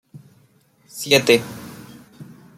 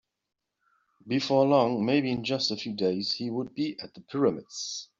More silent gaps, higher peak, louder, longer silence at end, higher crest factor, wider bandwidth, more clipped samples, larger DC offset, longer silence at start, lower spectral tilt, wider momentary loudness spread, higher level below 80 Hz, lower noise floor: neither; first, 0 dBFS vs -10 dBFS; first, -17 LUFS vs -28 LUFS; first, 0.35 s vs 0.15 s; first, 24 dB vs 18 dB; first, 16 kHz vs 7.8 kHz; neither; neither; second, 0.15 s vs 1.05 s; second, -3.5 dB/octave vs -5 dB/octave; first, 24 LU vs 12 LU; first, -62 dBFS vs -70 dBFS; second, -57 dBFS vs -85 dBFS